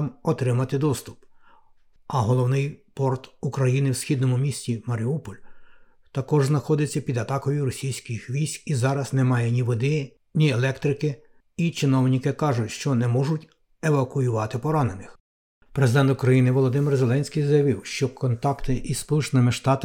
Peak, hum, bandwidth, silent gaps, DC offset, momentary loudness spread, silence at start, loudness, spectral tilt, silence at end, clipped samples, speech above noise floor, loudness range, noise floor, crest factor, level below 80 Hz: -6 dBFS; none; 15.5 kHz; 15.20-15.61 s; under 0.1%; 9 LU; 0 s; -24 LUFS; -6.5 dB/octave; 0 s; under 0.1%; 32 dB; 4 LU; -54 dBFS; 16 dB; -48 dBFS